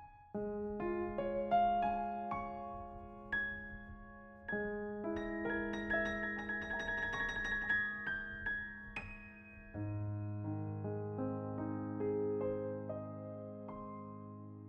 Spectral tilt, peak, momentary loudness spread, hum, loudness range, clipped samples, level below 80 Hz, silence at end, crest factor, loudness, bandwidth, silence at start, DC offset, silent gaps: -7 dB/octave; -22 dBFS; 15 LU; none; 5 LU; under 0.1%; -58 dBFS; 0 s; 18 dB; -40 LUFS; 8.2 kHz; 0 s; under 0.1%; none